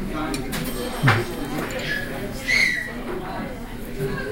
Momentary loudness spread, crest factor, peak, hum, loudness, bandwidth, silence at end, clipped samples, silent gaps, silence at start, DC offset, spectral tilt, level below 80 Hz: 13 LU; 20 dB; -4 dBFS; none; -24 LUFS; 17 kHz; 0 s; under 0.1%; none; 0 s; under 0.1%; -4.5 dB/octave; -36 dBFS